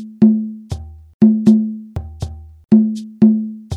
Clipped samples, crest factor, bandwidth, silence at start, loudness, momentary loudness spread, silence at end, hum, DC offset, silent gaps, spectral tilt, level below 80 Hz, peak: under 0.1%; 16 dB; 6.6 kHz; 0 s; -14 LUFS; 17 LU; 0 s; none; under 0.1%; 1.14-1.20 s; -9 dB/octave; -38 dBFS; 0 dBFS